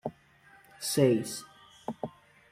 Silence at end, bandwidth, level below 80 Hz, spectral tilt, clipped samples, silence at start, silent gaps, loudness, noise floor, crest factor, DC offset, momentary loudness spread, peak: 0.4 s; 16 kHz; -70 dBFS; -5 dB/octave; under 0.1%; 0.05 s; none; -30 LUFS; -60 dBFS; 20 dB; under 0.1%; 18 LU; -12 dBFS